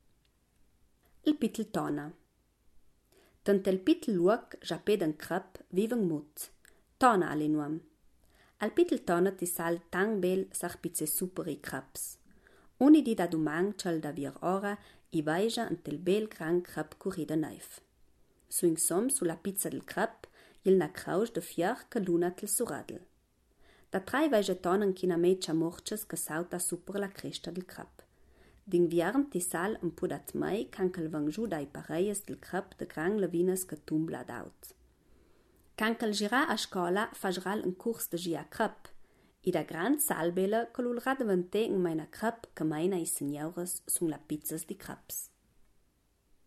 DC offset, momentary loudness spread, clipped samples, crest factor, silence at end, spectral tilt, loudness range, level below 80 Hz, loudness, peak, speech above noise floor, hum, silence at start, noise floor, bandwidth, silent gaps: under 0.1%; 11 LU; under 0.1%; 22 dB; 1.2 s; -4.5 dB/octave; 4 LU; -66 dBFS; -32 LUFS; -10 dBFS; 39 dB; none; 1.25 s; -71 dBFS; 15.5 kHz; none